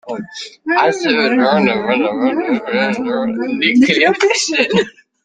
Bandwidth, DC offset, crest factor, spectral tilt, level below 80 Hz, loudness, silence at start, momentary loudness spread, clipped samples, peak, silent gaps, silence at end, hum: 9.4 kHz; under 0.1%; 14 dB; -4 dB/octave; -58 dBFS; -14 LUFS; 0.05 s; 9 LU; under 0.1%; -2 dBFS; none; 0.35 s; none